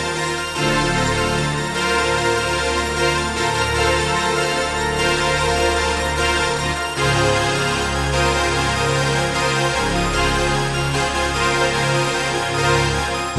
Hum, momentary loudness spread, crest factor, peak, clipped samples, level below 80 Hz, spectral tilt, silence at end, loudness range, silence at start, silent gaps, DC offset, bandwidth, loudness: none; 3 LU; 14 dB; -4 dBFS; under 0.1%; -32 dBFS; -3.5 dB/octave; 0 s; 0 LU; 0 s; none; under 0.1%; 12 kHz; -18 LUFS